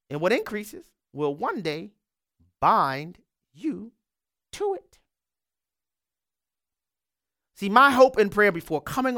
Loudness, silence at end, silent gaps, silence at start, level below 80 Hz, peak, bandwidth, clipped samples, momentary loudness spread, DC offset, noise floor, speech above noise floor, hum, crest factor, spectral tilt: -23 LUFS; 0 s; none; 0.1 s; -60 dBFS; -2 dBFS; 17.5 kHz; under 0.1%; 19 LU; under 0.1%; under -90 dBFS; over 67 dB; none; 24 dB; -5 dB/octave